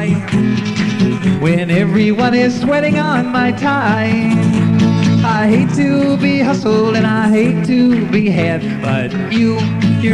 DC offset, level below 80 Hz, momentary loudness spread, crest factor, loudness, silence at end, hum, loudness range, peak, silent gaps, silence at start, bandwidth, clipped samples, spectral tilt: under 0.1%; -44 dBFS; 3 LU; 10 dB; -13 LUFS; 0 s; none; 1 LU; -2 dBFS; none; 0 s; 10.5 kHz; under 0.1%; -7 dB/octave